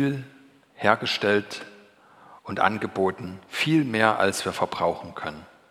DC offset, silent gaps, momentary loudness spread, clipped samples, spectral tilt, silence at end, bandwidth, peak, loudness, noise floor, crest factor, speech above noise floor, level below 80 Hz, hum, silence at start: under 0.1%; none; 16 LU; under 0.1%; -4.5 dB/octave; 0.25 s; 15.5 kHz; 0 dBFS; -25 LUFS; -53 dBFS; 26 dB; 28 dB; -64 dBFS; none; 0 s